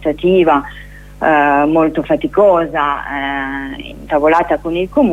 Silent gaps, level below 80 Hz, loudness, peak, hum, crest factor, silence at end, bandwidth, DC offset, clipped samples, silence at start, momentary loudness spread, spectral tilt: none; -38 dBFS; -14 LUFS; 0 dBFS; 50 Hz at -35 dBFS; 14 dB; 0 s; 13 kHz; under 0.1%; under 0.1%; 0 s; 12 LU; -7.5 dB/octave